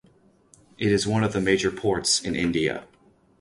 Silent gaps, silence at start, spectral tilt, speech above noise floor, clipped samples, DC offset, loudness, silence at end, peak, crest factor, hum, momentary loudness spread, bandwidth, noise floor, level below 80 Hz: none; 0.8 s; -4 dB/octave; 35 dB; under 0.1%; under 0.1%; -23 LUFS; 0.55 s; -8 dBFS; 18 dB; none; 6 LU; 11.5 kHz; -59 dBFS; -50 dBFS